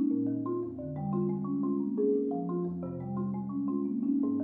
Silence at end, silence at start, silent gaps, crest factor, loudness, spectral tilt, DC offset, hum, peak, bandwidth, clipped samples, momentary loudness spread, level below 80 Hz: 0 s; 0 s; none; 14 dB; -32 LUFS; -14 dB/octave; under 0.1%; none; -18 dBFS; 2.2 kHz; under 0.1%; 7 LU; -68 dBFS